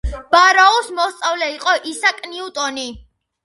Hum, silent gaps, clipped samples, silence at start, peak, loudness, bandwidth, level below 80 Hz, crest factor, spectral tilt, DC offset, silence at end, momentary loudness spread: none; none; under 0.1%; 0.05 s; 0 dBFS; -15 LUFS; 11.5 kHz; -36 dBFS; 18 dB; -2 dB/octave; under 0.1%; 0.45 s; 16 LU